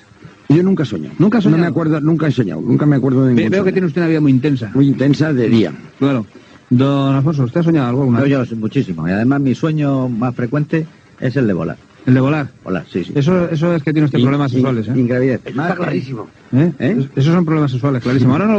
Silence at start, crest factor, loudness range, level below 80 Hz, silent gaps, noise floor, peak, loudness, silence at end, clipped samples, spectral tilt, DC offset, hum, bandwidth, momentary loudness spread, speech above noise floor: 0.25 s; 14 dB; 3 LU; -52 dBFS; none; -40 dBFS; 0 dBFS; -15 LUFS; 0 s; under 0.1%; -8.5 dB/octave; under 0.1%; none; 7.8 kHz; 7 LU; 25 dB